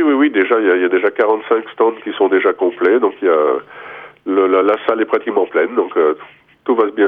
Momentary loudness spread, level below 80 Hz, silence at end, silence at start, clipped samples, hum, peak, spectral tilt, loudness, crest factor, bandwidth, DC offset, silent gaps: 8 LU; -66 dBFS; 0 s; 0 s; under 0.1%; none; -2 dBFS; -7.5 dB/octave; -15 LUFS; 14 dB; 3.8 kHz; under 0.1%; none